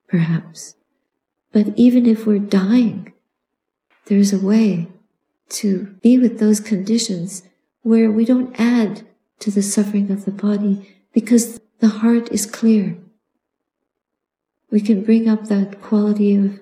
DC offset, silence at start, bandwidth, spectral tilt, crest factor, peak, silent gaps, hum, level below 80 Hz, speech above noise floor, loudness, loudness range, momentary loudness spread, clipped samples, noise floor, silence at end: under 0.1%; 0.1 s; 15 kHz; -6 dB/octave; 16 dB; -2 dBFS; none; none; -70 dBFS; 65 dB; -17 LUFS; 3 LU; 12 LU; under 0.1%; -81 dBFS; 0.05 s